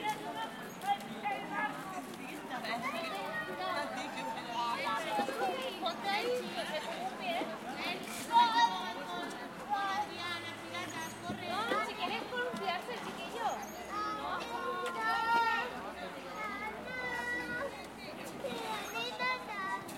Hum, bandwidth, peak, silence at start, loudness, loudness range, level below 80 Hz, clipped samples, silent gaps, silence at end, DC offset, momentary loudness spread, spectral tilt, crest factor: none; 16.5 kHz; -16 dBFS; 0 s; -36 LUFS; 5 LU; -70 dBFS; under 0.1%; none; 0 s; under 0.1%; 10 LU; -3 dB/octave; 22 dB